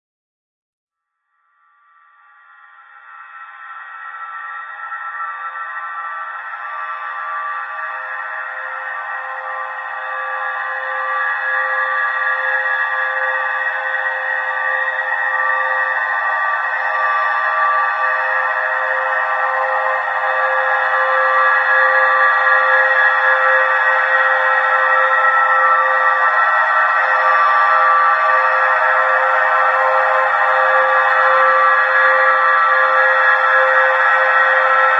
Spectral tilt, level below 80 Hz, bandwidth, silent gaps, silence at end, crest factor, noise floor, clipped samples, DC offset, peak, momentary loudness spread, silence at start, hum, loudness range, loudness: -1 dB/octave; -80 dBFS; 7.8 kHz; none; 0 s; 16 dB; -72 dBFS; under 0.1%; under 0.1%; 0 dBFS; 13 LU; 2.95 s; none; 13 LU; -14 LUFS